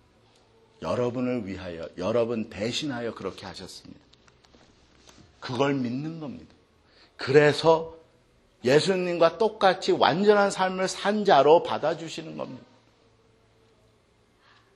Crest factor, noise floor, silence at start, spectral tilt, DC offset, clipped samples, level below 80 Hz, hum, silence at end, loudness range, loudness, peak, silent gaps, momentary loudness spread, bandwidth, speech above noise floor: 24 dB; -63 dBFS; 0.8 s; -5 dB/octave; under 0.1%; under 0.1%; -64 dBFS; none; 2.15 s; 11 LU; -24 LUFS; -4 dBFS; none; 19 LU; 12 kHz; 39 dB